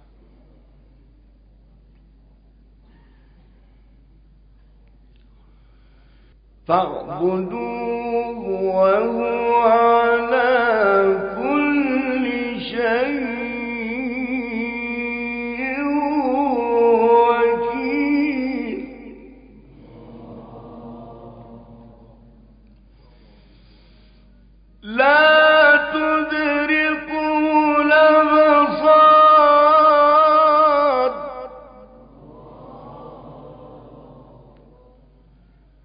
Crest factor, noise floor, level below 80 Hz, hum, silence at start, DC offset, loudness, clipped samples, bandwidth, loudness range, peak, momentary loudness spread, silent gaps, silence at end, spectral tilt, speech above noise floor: 16 dB; -52 dBFS; -50 dBFS; none; 6.7 s; under 0.1%; -17 LUFS; under 0.1%; 5.2 kHz; 13 LU; -2 dBFS; 19 LU; none; 1.9 s; -9.5 dB/octave; 34 dB